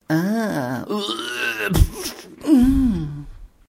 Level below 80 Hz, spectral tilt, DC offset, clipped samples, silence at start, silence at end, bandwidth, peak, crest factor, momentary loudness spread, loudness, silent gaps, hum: -28 dBFS; -5.5 dB/octave; under 0.1%; under 0.1%; 0.1 s; 0.2 s; 16 kHz; 0 dBFS; 20 dB; 14 LU; -21 LUFS; none; none